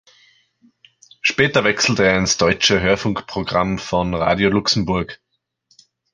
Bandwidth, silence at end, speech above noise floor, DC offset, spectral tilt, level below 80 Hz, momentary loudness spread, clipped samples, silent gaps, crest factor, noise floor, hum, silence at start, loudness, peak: 10.5 kHz; 1 s; 47 dB; under 0.1%; -4 dB/octave; -42 dBFS; 7 LU; under 0.1%; none; 18 dB; -64 dBFS; none; 1.25 s; -17 LUFS; -2 dBFS